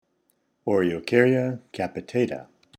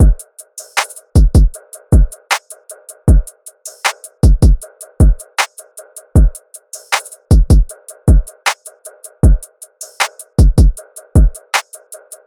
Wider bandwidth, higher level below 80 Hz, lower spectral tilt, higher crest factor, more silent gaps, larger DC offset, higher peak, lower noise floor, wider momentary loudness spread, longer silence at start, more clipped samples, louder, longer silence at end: second, 12.5 kHz vs 15 kHz; second, -64 dBFS vs -14 dBFS; first, -7 dB/octave vs -5 dB/octave; first, 22 dB vs 12 dB; neither; neither; second, -4 dBFS vs 0 dBFS; first, -70 dBFS vs -37 dBFS; second, 12 LU vs 22 LU; first, 0.65 s vs 0 s; neither; second, -24 LUFS vs -15 LUFS; about the same, 0.35 s vs 0.3 s